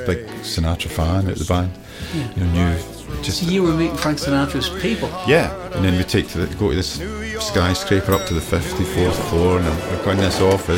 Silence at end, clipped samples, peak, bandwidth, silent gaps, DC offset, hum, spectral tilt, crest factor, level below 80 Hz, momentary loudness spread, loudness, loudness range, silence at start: 0 s; under 0.1%; -2 dBFS; 17 kHz; none; under 0.1%; none; -5.5 dB/octave; 16 dB; -32 dBFS; 8 LU; -20 LUFS; 2 LU; 0 s